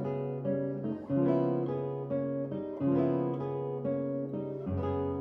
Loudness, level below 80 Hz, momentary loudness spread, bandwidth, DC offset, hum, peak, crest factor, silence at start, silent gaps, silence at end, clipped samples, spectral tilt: -33 LUFS; -62 dBFS; 7 LU; 4.4 kHz; under 0.1%; none; -16 dBFS; 16 dB; 0 s; none; 0 s; under 0.1%; -11.5 dB/octave